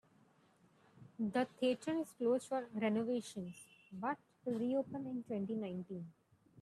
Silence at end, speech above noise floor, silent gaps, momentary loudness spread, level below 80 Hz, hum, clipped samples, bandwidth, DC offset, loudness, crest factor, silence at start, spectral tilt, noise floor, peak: 0 s; 32 dB; none; 13 LU; -82 dBFS; none; under 0.1%; 13 kHz; under 0.1%; -40 LUFS; 18 dB; 0.95 s; -6 dB/octave; -70 dBFS; -24 dBFS